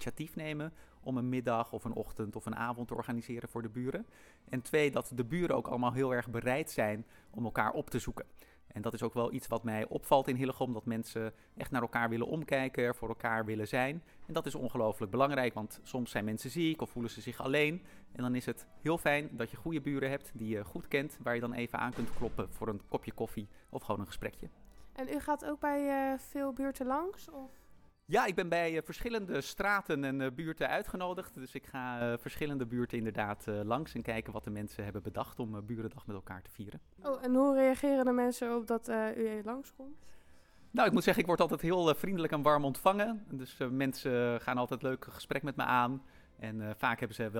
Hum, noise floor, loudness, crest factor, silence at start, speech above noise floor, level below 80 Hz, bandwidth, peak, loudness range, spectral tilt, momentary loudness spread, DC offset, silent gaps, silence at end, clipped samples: none; -58 dBFS; -35 LUFS; 22 dB; 0 s; 23 dB; -58 dBFS; 18.5 kHz; -12 dBFS; 6 LU; -6 dB/octave; 13 LU; under 0.1%; none; 0 s; under 0.1%